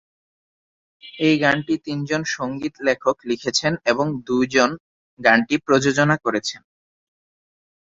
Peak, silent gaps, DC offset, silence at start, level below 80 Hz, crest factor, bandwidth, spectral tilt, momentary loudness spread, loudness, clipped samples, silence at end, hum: -2 dBFS; 4.80-5.17 s; under 0.1%; 1.05 s; -58 dBFS; 20 dB; 8 kHz; -4.5 dB/octave; 9 LU; -20 LUFS; under 0.1%; 1.25 s; none